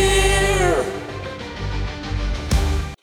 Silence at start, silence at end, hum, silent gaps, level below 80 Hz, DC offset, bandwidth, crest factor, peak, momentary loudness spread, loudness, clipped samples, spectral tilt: 0 s; 0.1 s; none; none; -24 dBFS; under 0.1%; 16.5 kHz; 16 dB; -4 dBFS; 13 LU; -21 LUFS; under 0.1%; -4 dB/octave